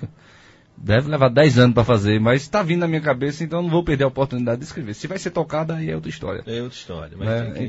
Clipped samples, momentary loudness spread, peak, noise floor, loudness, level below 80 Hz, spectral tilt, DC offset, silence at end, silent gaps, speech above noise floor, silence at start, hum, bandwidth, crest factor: under 0.1%; 15 LU; -2 dBFS; -50 dBFS; -20 LUFS; -44 dBFS; -7 dB/octave; under 0.1%; 0 s; none; 30 dB; 0 s; none; 8 kHz; 18 dB